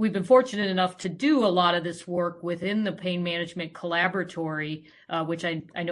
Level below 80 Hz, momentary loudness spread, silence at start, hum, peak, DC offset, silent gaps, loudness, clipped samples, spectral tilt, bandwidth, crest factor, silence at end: -70 dBFS; 11 LU; 0 s; none; -6 dBFS; under 0.1%; none; -26 LUFS; under 0.1%; -5.5 dB/octave; 11.5 kHz; 20 dB; 0 s